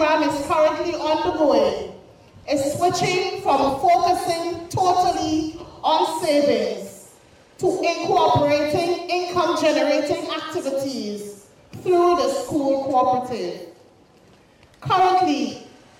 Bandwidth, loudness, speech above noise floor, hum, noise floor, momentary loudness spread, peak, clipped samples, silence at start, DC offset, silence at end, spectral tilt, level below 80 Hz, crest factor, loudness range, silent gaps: 16 kHz; -21 LUFS; 32 dB; none; -52 dBFS; 12 LU; -8 dBFS; under 0.1%; 0 s; under 0.1%; 0.3 s; -4.5 dB/octave; -54 dBFS; 14 dB; 2 LU; none